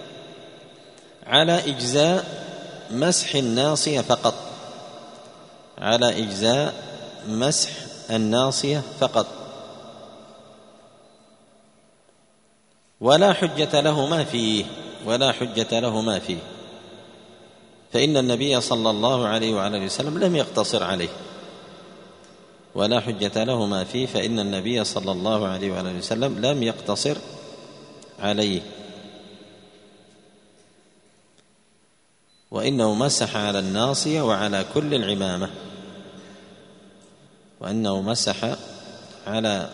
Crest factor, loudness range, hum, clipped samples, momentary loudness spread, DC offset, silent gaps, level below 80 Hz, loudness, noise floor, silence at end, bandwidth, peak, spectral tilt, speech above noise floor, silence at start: 24 dB; 8 LU; none; under 0.1%; 22 LU; under 0.1%; none; -62 dBFS; -22 LUFS; -62 dBFS; 0 s; 10.5 kHz; 0 dBFS; -4 dB/octave; 40 dB; 0 s